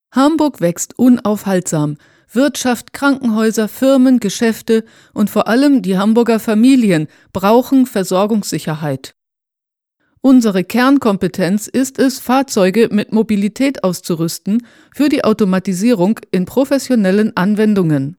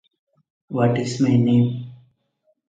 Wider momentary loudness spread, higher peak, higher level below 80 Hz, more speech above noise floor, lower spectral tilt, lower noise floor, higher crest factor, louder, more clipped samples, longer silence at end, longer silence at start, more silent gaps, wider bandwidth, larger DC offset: second, 7 LU vs 15 LU; first, 0 dBFS vs -4 dBFS; about the same, -56 dBFS vs -60 dBFS; first, 70 dB vs 50 dB; second, -5.5 dB/octave vs -7.5 dB/octave; first, -83 dBFS vs -68 dBFS; about the same, 14 dB vs 18 dB; first, -14 LUFS vs -20 LUFS; neither; second, 0.05 s vs 0.75 s; second, 0.15 s vs 0.7 s; neither; first, 18.5 kHz vs 9 kHz; neither